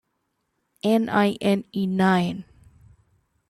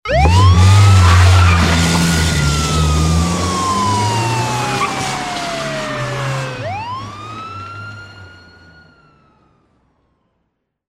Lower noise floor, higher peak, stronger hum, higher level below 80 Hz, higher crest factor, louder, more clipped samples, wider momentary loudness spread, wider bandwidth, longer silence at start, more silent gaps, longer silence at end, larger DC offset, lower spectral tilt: first, -75 dBFS vs -70 dBFS; second, -8 dBFS vs 0 dBFS; neither; second, -62 dBFS vs -26 dBFS; about the same, 18 dB vs 14 dB; second, -22 LUFS vs -14 LUFS; neither; second, 9 LU vs 19 LU; about the same, 13.5 kHz vs 14.5 kHz; first, 0.85 s vs 0.05 s; neither; second, 1.05 s vs 2.6 s; neither; first, -7 dB/octave vs -5 dB/octave